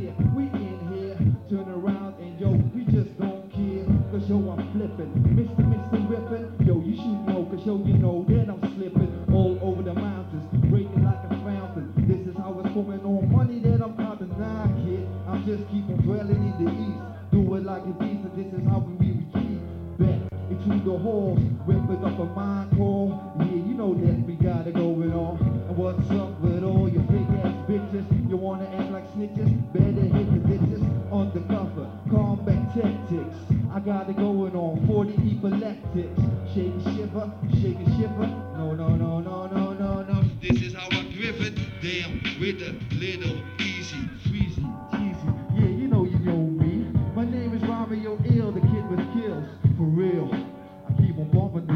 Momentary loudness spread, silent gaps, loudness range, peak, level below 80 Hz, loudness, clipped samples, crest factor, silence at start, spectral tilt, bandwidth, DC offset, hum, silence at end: 8 LU; none; 3 LU; -6 dBFS; -42 dBFS; -25 LUFS; under 0.1%; 18 dB; 0 s; -9 dB/octave; 6.8 kHz; under 0.1%; none; 0 s